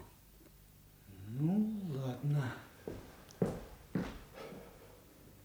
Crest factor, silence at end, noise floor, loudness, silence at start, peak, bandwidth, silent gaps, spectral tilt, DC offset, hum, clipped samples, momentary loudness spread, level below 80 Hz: 20 dB; 0 s; -60 dBFS; -39 LUFS; 0 s; -20 dBFS; over 20 kHz; none; -8 dB/octave; under 0.1%; 50 Hz at -60 dBFS; under 0.1%; 25 LU; -60 dBFS